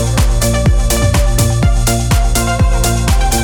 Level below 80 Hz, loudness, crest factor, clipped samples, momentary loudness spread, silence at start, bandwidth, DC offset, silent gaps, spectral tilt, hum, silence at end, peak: -14 dBFS; -13 LUFS; 10 dB; under 0.1%; 1 LU; 0 s; 19 kHz; under 0.1%; none; -4.5 dB/octave; none; 0 s; -2 dBFS